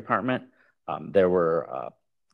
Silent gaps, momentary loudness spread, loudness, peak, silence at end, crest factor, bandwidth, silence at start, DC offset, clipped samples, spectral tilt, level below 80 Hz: none; 16 LU; -26 LUFS; -8 dBFS; 0.45 s; 18 dB; 4.9 kHz; 0 s; under 0.1%; under 0.1%; -9 dB/octave; -66 dBFS